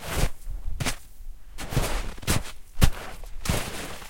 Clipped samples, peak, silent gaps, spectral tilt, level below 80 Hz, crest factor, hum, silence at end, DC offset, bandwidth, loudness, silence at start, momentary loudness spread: under 0.1%; -4 dBFS; none; -4 dB/octave; -32 dBFS; 24 dB; none; 0 s; 0.3%; 17 kHz; -29 LUFS; 0 s; 15 LU